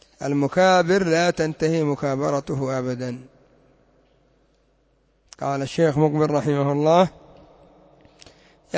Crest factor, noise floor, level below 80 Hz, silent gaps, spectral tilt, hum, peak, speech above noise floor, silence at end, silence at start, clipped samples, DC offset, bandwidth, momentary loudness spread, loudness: 18 dB; -63 dBFS; -56 dBFS; none; -6 dB/octave; none; -4 dBFS; 43 dB; 0 s; 0.2 s; under 0.1%; under 0.1%; 8 kHz; 10 LU; -21 LUFS